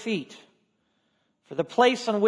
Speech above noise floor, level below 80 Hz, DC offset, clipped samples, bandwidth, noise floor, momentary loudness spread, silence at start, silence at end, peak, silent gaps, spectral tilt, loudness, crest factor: 48 dB; -80 dBFS; under 0.1%; under 0.1%; 10.5 kHz; -72 dBFS; 15 LU; 0 s; 0 s; -6 dBFS; none; -4.5 dB/octave; -25 LUFS; 20 dB